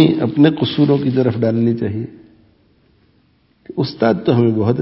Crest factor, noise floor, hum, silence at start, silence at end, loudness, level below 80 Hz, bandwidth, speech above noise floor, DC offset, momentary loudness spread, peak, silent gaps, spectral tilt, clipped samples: 16 dB; -57 dBFS; none; 0 s; 0 s; -16 LUFS; -48 dBFS; 5.8 kHz; 42 dB; under 0.1%; 9 LU; 0 dBFS; none; -10.5 dB/octave; under 0.1%